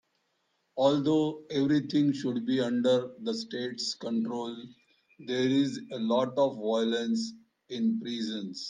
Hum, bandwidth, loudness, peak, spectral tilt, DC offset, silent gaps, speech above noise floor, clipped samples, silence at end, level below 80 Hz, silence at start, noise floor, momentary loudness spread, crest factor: none; 9.6 kHz; -29 LUFS; -12 dBFS; -5.5 dB/octave; under 0.1%; none; 47 dB; under 0.1%; 0 s; -76 dBFS; 0.75 s; -76 dBFS; 9 LU; 18 dB